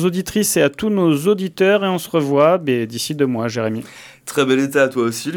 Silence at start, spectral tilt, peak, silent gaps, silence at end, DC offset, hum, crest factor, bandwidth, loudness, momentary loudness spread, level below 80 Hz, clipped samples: 0 s; -5 dB/octave; -2 dBFS; none; 0 s; under 0.1%; none; 16 dB; 19 kHz; -17 LUFS; 8 LU; -56 dBFS; under 0.1%